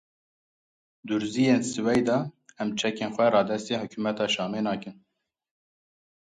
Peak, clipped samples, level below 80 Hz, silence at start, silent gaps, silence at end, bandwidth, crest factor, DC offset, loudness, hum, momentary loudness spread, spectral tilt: -10 dBFS; under 0.1%; -66 dBFS; 1.05 s; none; 1.4 s; 11 kHz; 18 dB; under 0.1%; -26 LUFS; none; 11 LU; -5 dB/octave